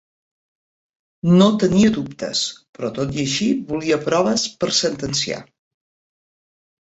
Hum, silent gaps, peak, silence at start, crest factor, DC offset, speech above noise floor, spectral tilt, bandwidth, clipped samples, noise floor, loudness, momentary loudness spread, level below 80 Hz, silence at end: none; 2.69-2.73 s; -2 dBFS; 1.25 s; 20 dB; under 0.1%; over 71 dB; -4.5 dB/octave; 8.2 kHz; under 0.1%; under -90 dBFS; -19 LUFS; 11 LU; -52 dBFS; 1.4 s